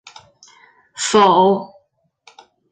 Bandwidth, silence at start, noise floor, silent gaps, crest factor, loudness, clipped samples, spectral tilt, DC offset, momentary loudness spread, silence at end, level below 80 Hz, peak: 9.6 kHz; 0.95 s; -62 dBFS; none; 16 dB; -15 LUFS; under 0.1%; -4 dB/octave; under 0.1%; 26 LU; 1.05 s; -62 dBFS; -2 dBFS